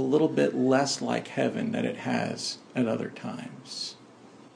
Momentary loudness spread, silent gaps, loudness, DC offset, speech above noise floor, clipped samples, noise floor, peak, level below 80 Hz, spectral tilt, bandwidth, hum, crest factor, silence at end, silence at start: 13 LU; none; -28 LUFS; under 0.1%; 24 dB; under 0.1%; -51 dBFS; -10 dBFS; -76 dBFS; -5 dB/octave; 10.5 kHz; none; 18 dB; 0.05 s; 0 s